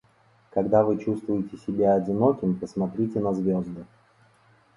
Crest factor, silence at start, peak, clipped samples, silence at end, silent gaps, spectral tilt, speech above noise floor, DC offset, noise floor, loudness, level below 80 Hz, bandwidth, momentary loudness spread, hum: 18 dB; 0.55 s; -6 dBFS; under 0.1%; 0.9 s; none; -10 dB/octave; 36 dB; under 0.1%; -61 dBFS; -25 LUFS; -58 dBFS; 10.5 kHz; 9 LU; none